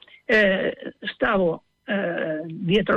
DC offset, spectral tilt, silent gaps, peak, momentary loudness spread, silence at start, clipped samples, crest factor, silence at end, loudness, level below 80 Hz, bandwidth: under 0.1%; -7 dB/octave; none; -10 dBFS; 12 LU; 0.3 s; under 0.1%; 14 dB; 0 s; -23 LUFS; -52 dBFS; 8.8 kHz